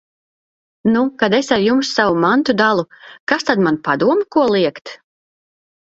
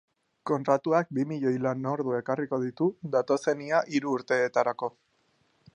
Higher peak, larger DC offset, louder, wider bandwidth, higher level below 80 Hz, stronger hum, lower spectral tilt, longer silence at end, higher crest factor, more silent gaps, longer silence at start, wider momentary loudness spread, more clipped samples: first, 0 dBFS vs -8 dBFS; neither; first, -16 LUFS vs -28 LUFS; second, 8 kHz vs 10.5 kHz; first, -56 dBFS vs -76 dBFS; neither; second, -5 dB/octave vs -6.5 dB/octave; first, 1 s vs 0.85 s; about the same, 16 dB vs 20 dB; first, 3.20-3.27 s vs none; first, 0.85 s vs 0.45 s; about the same, 7 LU vs 6 LU; neither